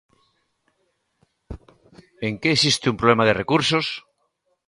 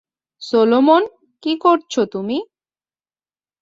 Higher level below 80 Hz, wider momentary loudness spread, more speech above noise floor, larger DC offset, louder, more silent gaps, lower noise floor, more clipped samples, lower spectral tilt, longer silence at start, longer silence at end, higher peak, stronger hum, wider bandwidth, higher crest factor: first, -52 dBFS vs -66 dBFS; first, 24 LU vs 14 LU; second, 51 dB vs over 74 dB; neither; second, -20 LUFS vs -17 LUFS; neither; second, -71 dBFS vs under -90 dBFS; neither; about the same, -4 dB/octave vs -5 dB/octave; first, 1.5 s vs 0.4 s; second, 0.7 s vs 1.15 s; about the same, -2 dBFS vs -2 dBFS; neither; first, 11.5 kHz vs 7.8 kHz; about the same, 22 dB vs 18 dB